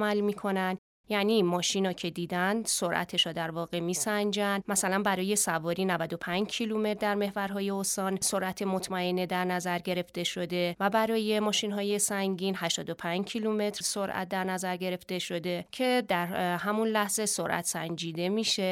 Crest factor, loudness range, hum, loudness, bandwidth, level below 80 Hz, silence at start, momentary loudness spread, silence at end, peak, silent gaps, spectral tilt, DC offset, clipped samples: 18 dB; 2 LU; none; -30 LUFS; 17.5 kHz; -68 dBFS; 0 s; 6 LU; 0 s; -12 dBFS; 0.78-1.04 s; -3.5 dB/octave; under 0.1%; under 0.1%